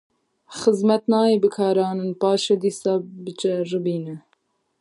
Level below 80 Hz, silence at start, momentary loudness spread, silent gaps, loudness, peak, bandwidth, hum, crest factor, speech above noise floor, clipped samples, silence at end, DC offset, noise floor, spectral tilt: -72 dBFS; 0.5 s; 12 LU; none; -21 LUFS; -4 dBFS; 11.5 kHz; none; 18 dB; 47 dB; under 0.1%; 0.6 s; under 0.1%; -68 dBFS; -6 dB/octave